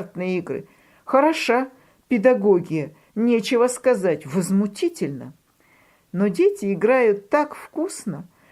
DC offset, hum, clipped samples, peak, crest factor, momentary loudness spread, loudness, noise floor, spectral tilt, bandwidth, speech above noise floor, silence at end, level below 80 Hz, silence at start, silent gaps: under 0.1%; none; under 0.1%; -4 dBFS; 18 dB; 14 LU; -21 LUFS; -58 dBFS; -5.5 dB/octave; 15 kHz; 38 dB; 0.3 s; -68 dBFS; 0 s; none